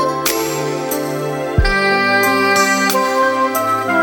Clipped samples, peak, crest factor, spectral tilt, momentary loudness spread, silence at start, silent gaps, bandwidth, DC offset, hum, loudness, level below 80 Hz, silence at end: under 0.1%; 0 dBFS; 14 dB; -3.5 dB/octave; 7 LU; 0 s; none; over 20 kHz; under 0.1%; none; -15 LUFS; -30 dBFS; 0 s